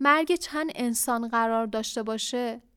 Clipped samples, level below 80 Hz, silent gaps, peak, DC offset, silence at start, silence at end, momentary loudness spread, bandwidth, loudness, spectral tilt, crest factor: under 0.1%; -62 dBFS; none; -8 dBFS; under 0.1%; 0 s; 0.15 s; 7 LU; 19 kHz; -27 LUFS; -2.5 dB/octave; 20 dB